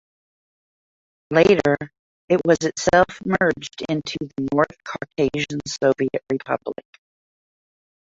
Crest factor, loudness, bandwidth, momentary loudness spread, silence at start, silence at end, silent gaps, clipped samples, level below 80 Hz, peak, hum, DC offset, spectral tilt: 20 dB; -21 LUFS; 7.8 kHz; 12 LU; 1.3 s; 1.3 s; 1.99-2.28 s; under 0.1%; -52 dBFS; -2 dBFS; none; under 0.1%; -5 dB/octave